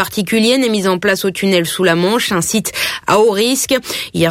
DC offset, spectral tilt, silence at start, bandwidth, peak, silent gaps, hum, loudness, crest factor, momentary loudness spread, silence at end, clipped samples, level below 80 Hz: under 0.1%; -3.5 dB/octave; 0 s; 16.5 kHz; -2 dBFS; none; none; -14 LUFS; 14 dB; 4 LU; 0 s; under 0.1%; -48 dBFS